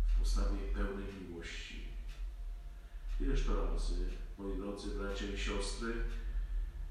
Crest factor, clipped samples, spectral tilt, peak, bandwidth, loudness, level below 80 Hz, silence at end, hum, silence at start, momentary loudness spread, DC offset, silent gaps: 14 dB; under 0.1%; -5 dB/octave; -22 dBFS; 11.5 kHz; -41 LUFS; -38 dBFS; 0 s; none; 0 s; 11 LU; under 0.1%; none